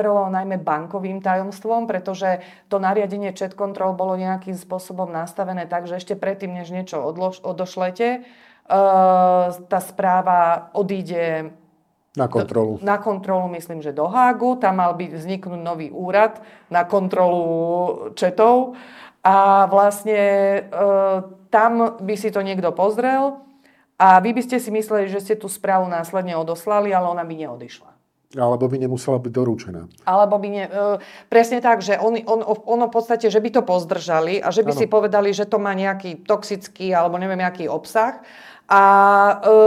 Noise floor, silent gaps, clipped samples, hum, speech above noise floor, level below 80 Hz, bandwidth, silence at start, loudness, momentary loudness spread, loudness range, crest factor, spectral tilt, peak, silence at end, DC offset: -61 dBFS; none; under 0.1%; none; 43 dB; -70 dBFS; 15 kHz; 0 s; -19 LUFS; 13 LU; 7 LU; 18 dB; -6 dB/octave; 0 dBFS; 0 s; under 0.1%